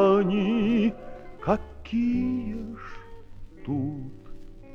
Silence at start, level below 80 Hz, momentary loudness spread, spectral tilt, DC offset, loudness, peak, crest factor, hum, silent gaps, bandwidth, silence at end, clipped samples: 0 s; -44 dBFS; 20 LU; -8.5 dB/octave; under 0.1%; -27 LUFS; -8 dBFS; 18 dB; 50 Hz at -55 dBFS; none; 6.8 kHz; 0 s; under 0.1%